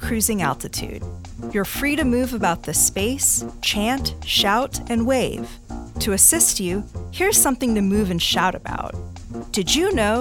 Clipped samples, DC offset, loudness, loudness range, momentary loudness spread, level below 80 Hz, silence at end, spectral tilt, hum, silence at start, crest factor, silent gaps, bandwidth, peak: under 0.1%; under 0.1%; -19 LUFS; 3 LU; 17 LU; -36 dBFS; 0 s; -2.5 dB/octave; none; 0 s; 20 dB; none; 19 kHz; -2 dBFS